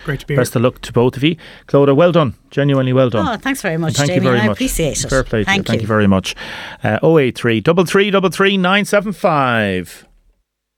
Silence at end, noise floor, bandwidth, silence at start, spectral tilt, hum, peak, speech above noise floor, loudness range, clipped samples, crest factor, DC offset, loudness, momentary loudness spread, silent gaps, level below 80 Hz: 0.8 s; -60 dBFS; 18 kHz; 0 s; -5.5 dB/octave; none; -2 dBFS; 45 dB; 2 LU; under 0.1%; 14 dB; under 0.1%; -15 LUFS; 7 LU; none; -38 dBFS